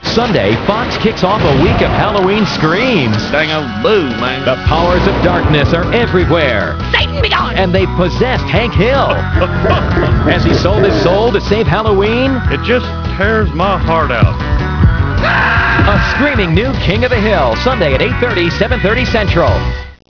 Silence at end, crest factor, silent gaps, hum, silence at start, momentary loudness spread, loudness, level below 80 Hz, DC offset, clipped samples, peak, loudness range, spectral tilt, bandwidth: 0.2 s; 12 dB; none; none; 0 s; 3 LU; -12 LUFS; -22 dBFS; 0.5%; under 0.1%; 0 dBFS; 1 LU; -6.5 dB/octave; 5.4 kHz